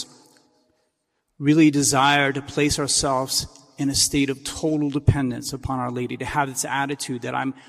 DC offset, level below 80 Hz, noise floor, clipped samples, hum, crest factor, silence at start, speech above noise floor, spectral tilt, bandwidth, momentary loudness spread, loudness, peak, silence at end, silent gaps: under 0.1%; -44 dBFS; -74 dBFS; under 0.1%; none; 18 dB; 0 s; 53 dB; -4 dB/octave; 15 kHz; 11 LU; -21 LUFS; -4 dBFS; 0.1 s; none